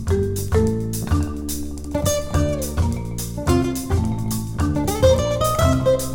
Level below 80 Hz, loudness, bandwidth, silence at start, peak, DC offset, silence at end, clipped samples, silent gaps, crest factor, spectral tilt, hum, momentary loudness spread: -30 dBFS; -21 LUFS; 17 kHz; 0 s; -2 dBFS; under 0.1%; 0 s; under 0.1%; none; 18 dB; -6 dB/octave; none; 9 LU